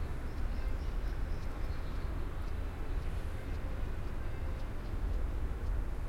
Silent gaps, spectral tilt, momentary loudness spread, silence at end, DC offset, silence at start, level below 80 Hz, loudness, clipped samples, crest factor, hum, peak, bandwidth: none; -7 dB/octave; 3 LU; 0 s; under 0.1%; 0 s; -36 dBFS; -41 LUFS; under 0.1%; 12 dB; none; -24 dBFS; 13 kHz